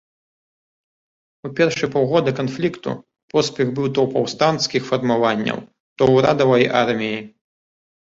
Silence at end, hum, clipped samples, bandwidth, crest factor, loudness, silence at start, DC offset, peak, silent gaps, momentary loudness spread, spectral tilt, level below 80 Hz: 0.85 s; none; under 0.1%; 8 kHz; 18 dB; -19 LUFS; 1.45 s; under 0.1%; -2 dBFS; 3.23-3.28 s, 5.80-5.96 s; 14 LU; -5.5 dB/octave; -56 dBFS